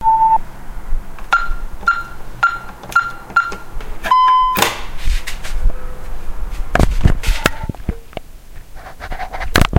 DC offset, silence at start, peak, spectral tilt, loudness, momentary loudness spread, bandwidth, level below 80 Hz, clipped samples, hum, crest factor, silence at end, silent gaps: under 0.1%; 0 s; 0 dBFS; -4.5 dB/octave; -17 LUFS; 20 LU; 17 kHz; -22 dBFS; under 0.1%; none; 16 dB; 0 s; none